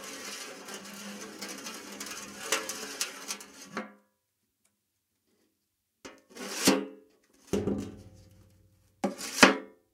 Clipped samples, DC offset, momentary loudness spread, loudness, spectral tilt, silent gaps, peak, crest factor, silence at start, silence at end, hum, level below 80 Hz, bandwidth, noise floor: under 0.1%; under 0.1%; 21 LU; -31 LUFS; -2.5 dB/octave; none; 0 dBFS; 34 dB; 0 s; 0.25 s; none; -66 dBFS; 16.5 kHz; -80 dBFS